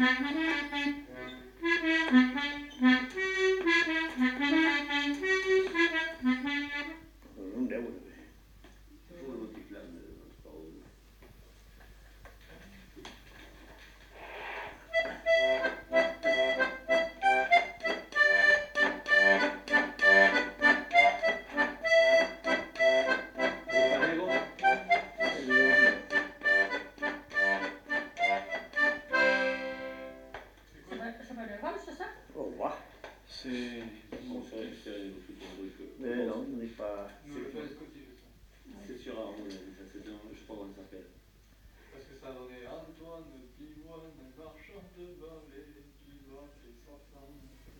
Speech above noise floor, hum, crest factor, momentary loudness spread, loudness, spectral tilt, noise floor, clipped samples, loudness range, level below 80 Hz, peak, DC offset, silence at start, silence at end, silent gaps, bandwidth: 28 dB; none; 20 dB; 24 LU; -28 LUFS; -3.5 dB/octave; -60 dBFS; under 0.1%; 24 LU; -60 dBFS; -10 dBFS; under 0.1%; 0 s; 0.3 s; none; 18.5 kHz